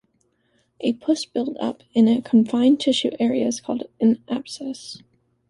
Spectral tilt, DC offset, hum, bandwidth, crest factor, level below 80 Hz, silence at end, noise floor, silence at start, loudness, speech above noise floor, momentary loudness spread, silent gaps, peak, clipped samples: -5 dB/octave; under 0.1%; none; 11.5 kHz; 16 dB; -66 dBFS; 0.5 s; -67 dBFS; 0.8 s; -21 LUFS; 46 dB; 14 LU; none; -6 dBFS; under 0.1%